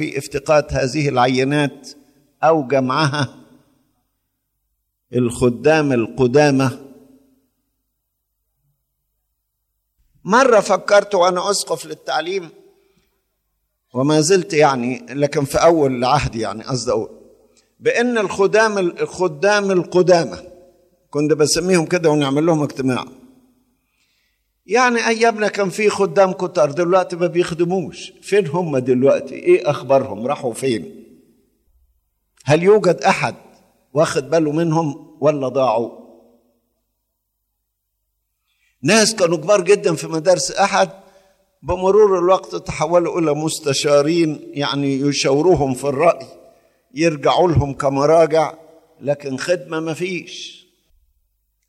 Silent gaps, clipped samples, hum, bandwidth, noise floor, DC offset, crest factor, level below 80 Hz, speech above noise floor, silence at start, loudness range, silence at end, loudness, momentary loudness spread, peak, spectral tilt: none; under 0.1%; none; 14.5 kHz; -74 dBFS; under 0.1%; 18 dB; -46 dBFS; 57 dB; 0 s; 4 LU; 1.15 s; -17 LUFS; 11 LU; 0 dBFS; -5 dB/octave